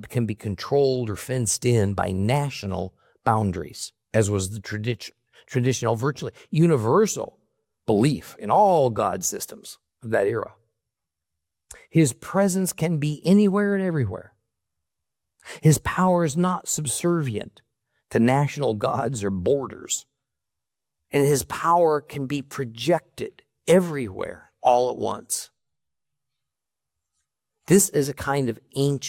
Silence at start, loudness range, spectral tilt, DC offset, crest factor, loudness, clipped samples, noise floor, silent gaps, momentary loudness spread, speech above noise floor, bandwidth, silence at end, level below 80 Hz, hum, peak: 0 s; 4 LU; -5.5 dB/octave; under 0.1%; 18 dB; -23 LUFS; under 0.1%; -87 dBFS; none; 14 LU; 65 dB; 17 kHz; 0 s; -56 dBFS; none; -4 dBFS